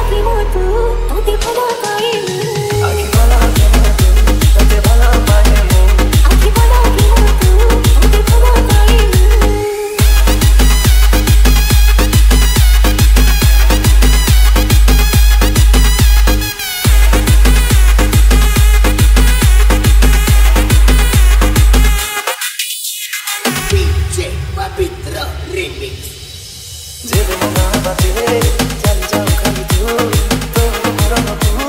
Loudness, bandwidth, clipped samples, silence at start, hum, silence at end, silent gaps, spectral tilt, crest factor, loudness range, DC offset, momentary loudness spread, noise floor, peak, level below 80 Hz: -11 LUFS; 16.5 kHz; under 0.1%; 0 s; none; 0 s; none; -4.5 dB/octave; 8 dB; 7 LU; under 0.1%; 7 LU; -29 dBFS; 0 dBFS; -10 dBFS